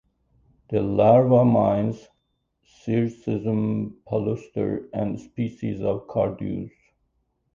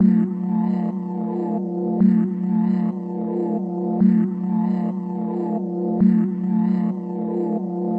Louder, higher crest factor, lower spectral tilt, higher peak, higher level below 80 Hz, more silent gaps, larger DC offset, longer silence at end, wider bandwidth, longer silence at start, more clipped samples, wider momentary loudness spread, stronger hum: about the same, -23 LUFS vs -21 LUFS; about the same, 18 dB vs 14 dB; second, -10 dB/octave vs -12 dB/octave; about the same, -6 dBFS vs -6 dBFS; first, -54 dBFS vs -62 dBFS; neither; neither; first, 0.85 s vs 0 s; first, 7.2 kHz vs 2.9 kHz; first, 0.7 s vs 0 s; neither; first, 14 LU vs 8 LU; neither